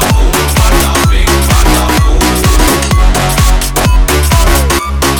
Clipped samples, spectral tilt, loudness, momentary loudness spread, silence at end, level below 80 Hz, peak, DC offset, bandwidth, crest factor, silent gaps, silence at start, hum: 0.4%; -4 dB/octave; -9 LUFS; 2 LU; 0 s; -10 dBFS; 0 dBFS; under 0.1%; over 20 kHz; 8 dB; none; 0 s; none